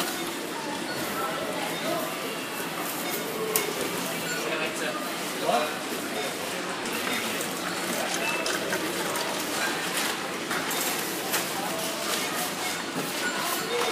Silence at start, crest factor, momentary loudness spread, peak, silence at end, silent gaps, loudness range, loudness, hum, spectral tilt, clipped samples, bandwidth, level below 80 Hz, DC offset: 0 s; 24 dB; 4 LU; -6 dBFS; 0 s; none; 2 LU; -28 LUFS; none; -2 dB/octave; under 0.1%; 15.5 kHz; -68 dBFS; under 0.1%